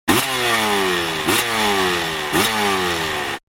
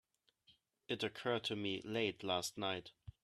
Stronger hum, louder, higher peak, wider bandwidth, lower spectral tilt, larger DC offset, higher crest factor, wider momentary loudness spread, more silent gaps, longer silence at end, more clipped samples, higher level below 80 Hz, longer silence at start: neither; first, -18 LUFS vs -40 LUFS; first, -2 dBFS vs -22 dBFS; first, 16.5 kHz vs 13.5 kHz; second, -2.5 dB/octave vs -4 dB/octave; neither; about the same, 18 dB vs 20 dB; second, 3 LU vs 6 LU; neither; about the same, 0.1 s vs 0.15 s; neither; first, -46 dBFS vs -74 dBFS; second, 0.05 s vs 0.5 s